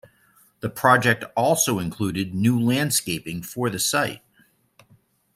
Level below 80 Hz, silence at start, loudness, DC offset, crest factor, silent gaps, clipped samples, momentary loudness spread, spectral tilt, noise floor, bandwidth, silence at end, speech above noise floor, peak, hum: -58 dBFS; 0.65 s; -22 LUFS; under 0.1%; 22 dB; none; under 0.1%; 11 LU; -4 dB/octave; -61 dBFS; 16 kHz; 1.2 s; 39 dB; -2 dBFS; none